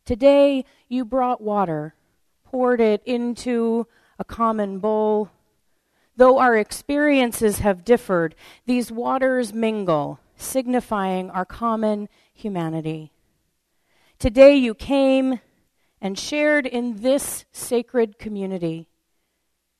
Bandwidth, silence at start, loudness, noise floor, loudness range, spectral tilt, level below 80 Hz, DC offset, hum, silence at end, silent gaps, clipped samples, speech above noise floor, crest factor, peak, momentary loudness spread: 13.5 kHz; 0.05 s; -21 LUFS; -73 dBFS; 6 LU; -5 dB/octave; -46 dBFS; under 0.1%; none; 0.95 s; none; under 0.1%; 54 dB; 22 dB; 0 dBFS; 14 LU